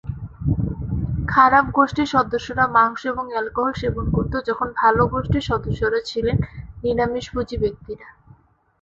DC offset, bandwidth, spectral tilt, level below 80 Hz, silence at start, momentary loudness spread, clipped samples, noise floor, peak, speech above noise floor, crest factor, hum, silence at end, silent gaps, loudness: under 0.1%; 7.8 kHz; -7 dB/octave; -36 dBFS; 0.05 s; 10 LU; under 0.1%; -52 dBFS; -2 dBFS; 32 dB; 20 dB; none; 0.7 s; none; -21 LUFS